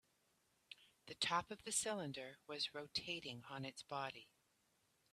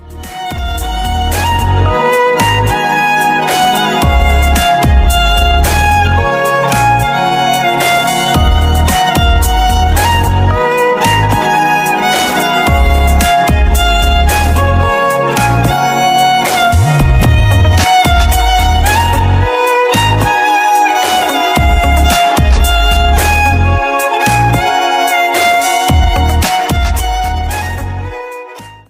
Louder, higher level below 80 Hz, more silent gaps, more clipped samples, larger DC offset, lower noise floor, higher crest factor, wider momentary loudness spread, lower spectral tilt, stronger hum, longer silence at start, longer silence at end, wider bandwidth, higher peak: second, -44 LUFS vs -10 LUFS; second, -80 dBFS vs -16 dBFS; neither; neither; neither; first, -81 dBFS vs -30 dBFS; first, 22 dB vs 10 dB; first, 18 LU vs 4 LU; second, -2 dB/octave vs -4.5 dB/octave; neither; first, 0.7 s vs 0.05 s; first, 0.9 s vs 0.15 s; second, 14.5 kHz vs 16 kHz; second, -26 dBFS vs 0 dBFS